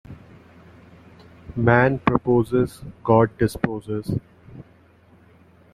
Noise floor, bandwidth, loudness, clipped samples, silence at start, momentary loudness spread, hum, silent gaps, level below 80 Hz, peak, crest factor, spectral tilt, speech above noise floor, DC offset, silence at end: -53 dBFS; 14 kHz; -21 LUFS; under 0.1%; 0.1 s; 12 LU; none; none; -48 dBFS; -2 dBFS; 22 dB; -8 dB/octave; 33 dB; under 0.1%; 1.1 s